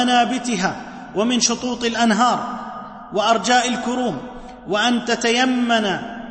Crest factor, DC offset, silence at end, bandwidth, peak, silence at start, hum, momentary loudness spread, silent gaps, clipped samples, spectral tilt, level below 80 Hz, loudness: 16 dB; under 0.1%; 0 s; 8.8 kHz; -4 dBFS; 0 s; none; 14 LU; none; under 0.1%; -3 dB/octave; -52 dBFS; -19 LUFS